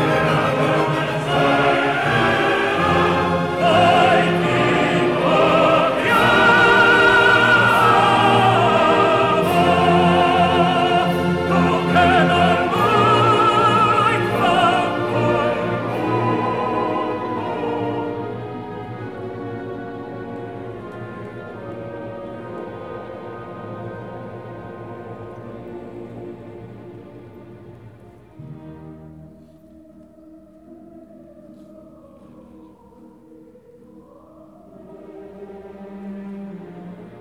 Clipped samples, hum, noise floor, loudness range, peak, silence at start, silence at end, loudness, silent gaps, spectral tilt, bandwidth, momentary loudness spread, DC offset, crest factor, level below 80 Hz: under 0.1%; none; -46 dBFS; 22 LU; -4 dBFS; 0 s; 0 s; -16 LUFS; none; -6 dB/octave; 15.5 kHz; 22 LU; 0.2%; 16 dB; -48 dBFS